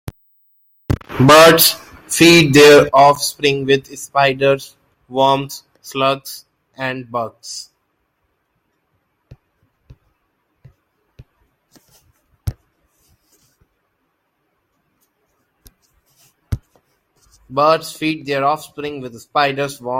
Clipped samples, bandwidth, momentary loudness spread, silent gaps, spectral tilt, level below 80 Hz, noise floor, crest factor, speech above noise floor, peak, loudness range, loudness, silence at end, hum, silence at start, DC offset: under 0.1%; 16.5 kHz; 23 LU; none; -4 dB/octave; -44 dBFS; -68 dBFS; 18 dB; 55 dB; 0 dBFS; 23 LU; -13 LUFS; 0 s; none; 0.05 s; under 0.1%